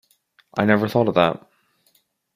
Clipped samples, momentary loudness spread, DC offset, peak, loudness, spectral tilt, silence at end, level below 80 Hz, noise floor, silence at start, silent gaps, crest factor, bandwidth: under 0.1%; 11 LU; under 0.1%; -2 dBFS; -20 LUFS; -7.5 dB/octave; 1 s; -60 dBFS; -64 dBFS; 0.55 s; none; 20 dB; 15.5 kHz